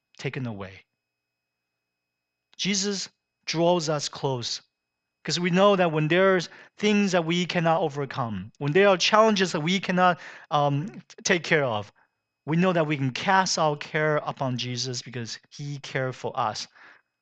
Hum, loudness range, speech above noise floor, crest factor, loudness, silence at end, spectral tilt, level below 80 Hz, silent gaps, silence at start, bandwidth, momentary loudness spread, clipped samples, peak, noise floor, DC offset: 60 Hz at -55 dBFS; 6 LU; 59 dB; 22 dB; -24 LUFS; 0.55 s; -4.5 dB/octave; -70 dBFS; none; 0.2 s; 9 kHz; 15 LU; under 0.1%; -2 dBFS; -83 dBFS; under 0.1%